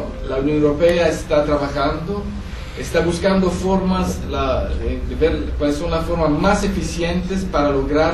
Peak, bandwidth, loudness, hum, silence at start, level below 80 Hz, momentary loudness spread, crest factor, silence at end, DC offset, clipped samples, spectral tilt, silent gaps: -4 dBFS; 13 kHz; -19 LUFS; none; 0 s; -28 dBFS; 8 LU; 14 dB; 0 s; under 0.1%; under 0.1%; -6 dB/octave; none